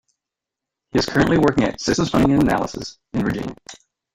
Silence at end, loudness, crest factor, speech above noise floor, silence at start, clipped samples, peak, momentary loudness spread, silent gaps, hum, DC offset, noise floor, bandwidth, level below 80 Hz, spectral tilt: 0.4 s; -19 LUFS; 18 dB; 66 dB; 0.95 s; under 0.1%; -2 dBFS; 12 LU; none; none; under 0.1%; -85 dBFS; 15.5 kHz; -42 dBFS; -5.5 dB/octave